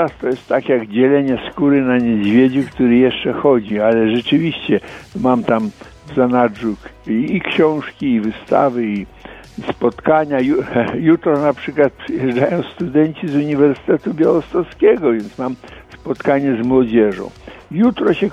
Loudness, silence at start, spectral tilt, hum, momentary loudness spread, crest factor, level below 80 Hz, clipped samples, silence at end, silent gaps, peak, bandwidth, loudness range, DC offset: -16 LUFS; 0 s; -8 dB/octave; none; 10 LU; 16 dB; -48 dBFS; under 0.1%; 0 s; none; 0 dBFS; 7.8 kHz; 3 LU; under 0.1%